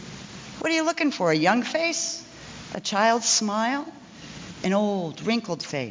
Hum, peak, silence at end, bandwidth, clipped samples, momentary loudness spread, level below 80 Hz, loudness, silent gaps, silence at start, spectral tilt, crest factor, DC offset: none; -8 dBFS; 0 s; 7.8 kHz; under 0.1%; 19 LU; -62 dBFS; -24 LUFS; none; 0 s; -3 dB/octave; 18 dB; under 0.1%